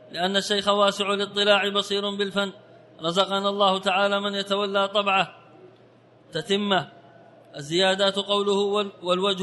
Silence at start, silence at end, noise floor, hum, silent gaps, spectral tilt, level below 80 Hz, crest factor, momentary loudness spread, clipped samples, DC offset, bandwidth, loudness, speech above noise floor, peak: 0.1 s; 0 s; -54 dBFS; none; none; -3.5 dB/octave; -70 dBFS; 18 dB; 8 LU; under 0.1%; under 0.1%; 11.5 kHz; -23 LUFS; 31 dB; -6 dBFS